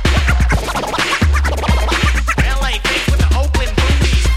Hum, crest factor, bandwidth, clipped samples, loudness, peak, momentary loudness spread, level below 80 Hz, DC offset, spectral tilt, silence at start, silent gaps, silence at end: none; 14 dB; 15 kHz; under 0.1%; -15 LUFS; 0 dBFS; 2 LU; -16 dBFS; under 0.1%; -4.5 dB/octave; 0 s; none; 0 s